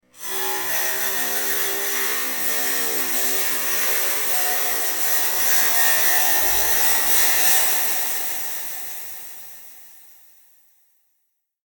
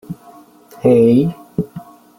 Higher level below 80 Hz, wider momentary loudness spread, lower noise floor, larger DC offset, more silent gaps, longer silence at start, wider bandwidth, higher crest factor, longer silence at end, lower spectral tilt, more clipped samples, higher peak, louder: second, -56 dBFS vs -50 dBFS; second, 13 LU vs 23 LU; first, -72 dBFS vs -43 dBFS; neither; neither; about the same, 0.15 s vs 0.1 s; first, 19.5 kHz vs 16 kHz; about the same, 18 dB vs 16 dB; first, 1.7 s vs 0.35 s; second, 1 dB/octave vs -9.5 dB/octave; neither; about the same, -4 dBFS vs -2 dBFS; about the same, -17 LUFS vs -15 LUFS